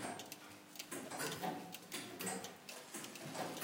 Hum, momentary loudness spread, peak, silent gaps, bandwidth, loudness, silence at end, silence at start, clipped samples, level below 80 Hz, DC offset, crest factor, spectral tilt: none; 9 LU; -28 dBFS; none; 17 kHz; -46 LUFS; 0 s; 0 s; under 0.1%; -88 dBFS; under 0.1%; 18 dB; -2.5 dB/octave